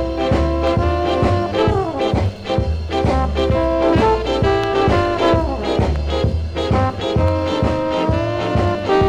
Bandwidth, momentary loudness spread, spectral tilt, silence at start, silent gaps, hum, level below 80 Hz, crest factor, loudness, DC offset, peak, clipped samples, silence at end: 9.8 kHz; 4 LU; -7 dB/octave; 0 s; none; none; -26 dBFS; 14 dB; -18 LUFS; under 0.1%; -2 dBFS; under 0.1%; 0 s